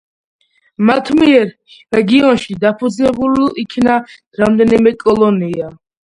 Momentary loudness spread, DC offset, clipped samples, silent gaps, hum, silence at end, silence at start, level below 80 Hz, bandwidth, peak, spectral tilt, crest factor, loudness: 8 LU; under 0.1%; under 0.1%; 4.27-4.31 s; none; 0.3 s; 0.8 s; -46 dBFS; 11 kHz; 0 dBFS; -6.5 dB/octave; 14 dB; -13 LUFS